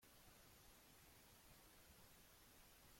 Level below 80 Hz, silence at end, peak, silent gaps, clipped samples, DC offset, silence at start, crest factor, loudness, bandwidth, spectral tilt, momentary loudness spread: -76 dBFS; 0 s; -54 dBFS; none; under 0.1%; under 0.1%; 0 s; 14 dB; -67 LUFS; 16.5 kHz; -2.5 dB/octave; 0 LU